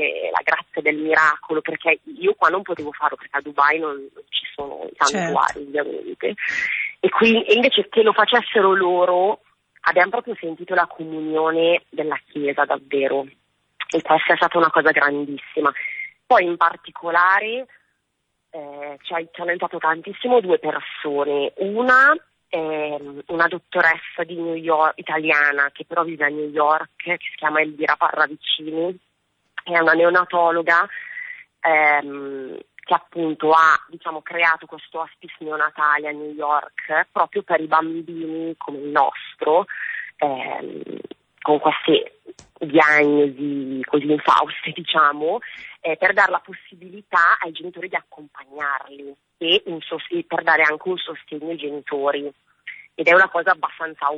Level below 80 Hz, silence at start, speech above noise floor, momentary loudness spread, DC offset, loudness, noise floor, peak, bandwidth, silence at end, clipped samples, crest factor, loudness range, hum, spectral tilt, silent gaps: -68 dBFS; 0 s; 54 dB; 15 LU; under 0.1%; -19 LUFS; -74 dBFS; -4 dBFS; 8.6 kHz; 0 s; under 0.1%; 16 dB; 4 LU; none; -4 dB/octave; none